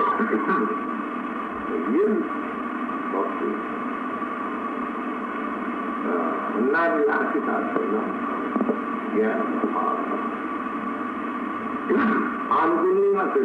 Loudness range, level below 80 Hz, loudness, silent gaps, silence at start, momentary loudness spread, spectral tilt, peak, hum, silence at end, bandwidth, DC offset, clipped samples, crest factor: 4 LU; -64 dBFS; -25 LUFS; none; 0 s; 8 LU; -7.5 dB/octave; -10 dBFS; none; 0 s; 8.8 kHz; under 0.1%; under 0.1%; 16 dB